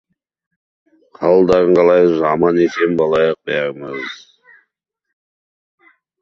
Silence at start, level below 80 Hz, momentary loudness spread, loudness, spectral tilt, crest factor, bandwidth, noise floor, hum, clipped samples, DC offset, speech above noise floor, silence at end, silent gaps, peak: 1.2 s; -52 dBFS; 15 LU; -14 LUFS; -7 dB/octave; 16 dB; 7.2 kHz; -73 dBFS; none; under 0.1%; under 0.1%; 60 dB; 2.05 s; none; -2 dBFS